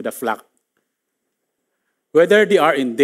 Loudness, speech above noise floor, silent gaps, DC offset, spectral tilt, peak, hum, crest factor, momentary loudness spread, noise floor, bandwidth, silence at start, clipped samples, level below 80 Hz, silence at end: -16 LUFS; 61 dB; none; under 0.1%; -4.5 dB/octave; -2 dBFS; none; 16 dB; 12 LU; -76 dBFS; 16 kHz; 0 s; under 0.1%; -78 dBFS; 0 s